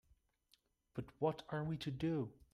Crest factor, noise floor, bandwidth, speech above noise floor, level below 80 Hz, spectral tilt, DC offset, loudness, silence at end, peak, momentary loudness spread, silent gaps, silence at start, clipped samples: 20 dB; -77 dBFS; 12.5 kHz; 36 dB; -68 dBFS; -7.5 dB/octave; under 0.1%; -42 LUFS; 0.2 s; -24 dBFS; 11 LU; none; 0.95 s; under 0.1%